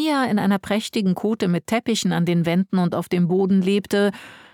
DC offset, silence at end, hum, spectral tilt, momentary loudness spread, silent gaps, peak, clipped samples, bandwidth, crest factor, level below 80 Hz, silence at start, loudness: under 0.1%; 0.15 s; none; -6 dB/octave; 4 LU; none; -8 dBFS; under 0.1%; 16.5 kHz; 12 dB; -60 dBFS; 0 s; -21 LUFS